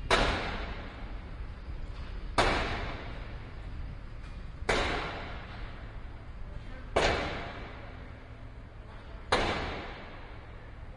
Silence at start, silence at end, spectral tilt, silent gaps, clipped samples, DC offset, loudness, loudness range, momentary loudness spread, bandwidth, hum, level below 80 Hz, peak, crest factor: 0 s; 0 s; -4.5 dB/octave; none; under 0.1%; under 0.1%; -34 LUFS; 3 LU; 19 LU; 11.5 kHz; none; -40 dBFS; -10 dBFS; 24 dB